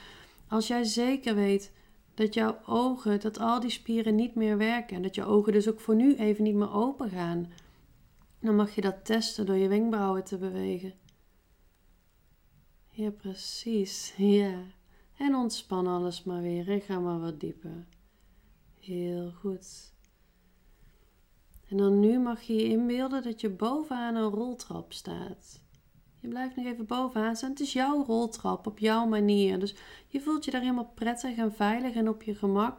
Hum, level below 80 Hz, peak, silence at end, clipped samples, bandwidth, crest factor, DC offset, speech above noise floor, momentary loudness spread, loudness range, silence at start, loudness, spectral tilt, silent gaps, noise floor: none; -62 dBFS; -12 dBFS; 0 s; under 0.1%; 16.5 kHz; 18 dB; under 0.1%; 35 dB; 14 LU; 10 LU; 0 s; -30 LUFS; -5.5 dB/octave; none; -64 dBFS